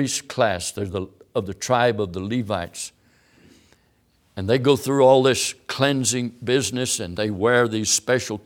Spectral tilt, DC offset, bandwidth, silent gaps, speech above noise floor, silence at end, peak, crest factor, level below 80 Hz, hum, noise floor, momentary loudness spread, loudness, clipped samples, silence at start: -4 dB/octave; under 0.1%; 18.5 kHz; none; 41 dB; 0.05 s; -2 dBFS; 20 dB; -56 dBFS; none; -62 dBFS; 12 LU; -21 LUFS; under 0.1%; 0 s